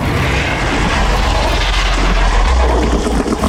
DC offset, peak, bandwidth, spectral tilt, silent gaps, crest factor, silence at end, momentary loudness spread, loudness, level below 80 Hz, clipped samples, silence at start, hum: under 0.1%; -2 dBFS; 13.5 kHz; -5 dB/octave; none; 10 dB; 0 s; 2 LU; -14 LUFS; -16 dBFS; under 0.1%; 0 s; none